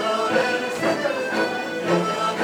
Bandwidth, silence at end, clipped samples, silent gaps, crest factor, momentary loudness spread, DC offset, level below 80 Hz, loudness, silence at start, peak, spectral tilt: 19.5 kHz; 0 s; under 0.1%; none; 14 dB; 3 LU; under 0.1%; -68 dBFS; -22 LUFS; 0 s; -8 dBFS; -4.5 dB/octave